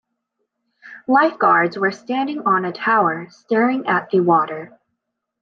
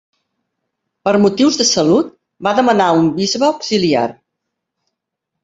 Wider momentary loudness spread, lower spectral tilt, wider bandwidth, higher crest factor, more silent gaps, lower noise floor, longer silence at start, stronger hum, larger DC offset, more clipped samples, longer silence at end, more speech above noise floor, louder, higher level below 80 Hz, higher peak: about the same, 9 LU vs 9 LU; first, -7 dB/octave vs -4 dB/octave; second, 7 kHz vs 8 kHz; about the same, 16 dB vs 14 dB; neither; about the same, -77 dBFS vs -78 dBFS; second, 0.85 s vs 1.05 s; neither; neither; neither; second, 0.75 s vs 1.3 s; second, 59 dB vs 65 dB; second, -18 LUFS vs -14 LUFS; second, -70 dBFS vs -56 dBFS; about the same, -2 dBFS vs -2 dBFS